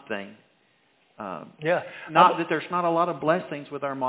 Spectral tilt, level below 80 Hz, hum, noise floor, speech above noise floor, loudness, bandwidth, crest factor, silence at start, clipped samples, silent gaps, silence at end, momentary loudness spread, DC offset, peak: -9 dB/octave; -76 dBFS; none; -65 dBFS; 40 dB; -24 LUFS; 4 kHz; 24 dB; 0.1 s; under 0.1%; none; 0 s; 18 LU; under 0.1%; -2 dBFS